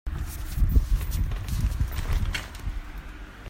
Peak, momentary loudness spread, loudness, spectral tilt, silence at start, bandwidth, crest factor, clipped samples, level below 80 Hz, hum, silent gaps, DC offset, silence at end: -8 dBFS; 14 LU; -30 LUFS; -5 dB/octave; 0.05 s; 16.5 kHz; 20 dB; under 0.1%; -28 dBFS; none; none; under 0.1%; 0 s